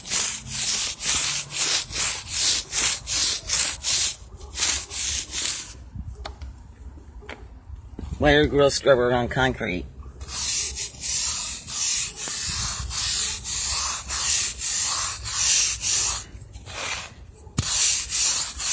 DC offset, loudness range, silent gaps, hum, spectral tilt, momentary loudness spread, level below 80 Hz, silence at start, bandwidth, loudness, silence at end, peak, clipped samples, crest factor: under 0.1%; 5 LU; none; none; -1.5 dB/octave; 19 LU; -40 dBFS; 0 s; 8 kHz; -23 LUFS; 0 s; -6 dBFS; under 0.1%; 20 dB